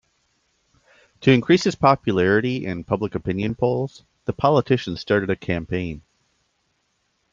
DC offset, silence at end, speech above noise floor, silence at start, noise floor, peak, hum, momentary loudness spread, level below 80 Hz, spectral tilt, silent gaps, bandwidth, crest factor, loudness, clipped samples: under 0.1%; 1.35 s; 49 dB; 1.2 s; -70 dBFS; -2 dBFS; none; 10 LU; -52 dBFS; -6.5 dB/octave; none; 7.8 kHz; 20 dB; -21 LUFS; under 0.1%